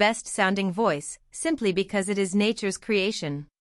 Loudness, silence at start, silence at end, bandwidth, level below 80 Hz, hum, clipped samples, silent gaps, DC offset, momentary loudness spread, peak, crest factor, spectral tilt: -26 LUFS; 0 s; 0.35 s; 12 kHz; -60 dBFS; none; under 0.1%; none; under 0.1%; 8 LU; -6 dBFS; 20 dB; -4 dB/octave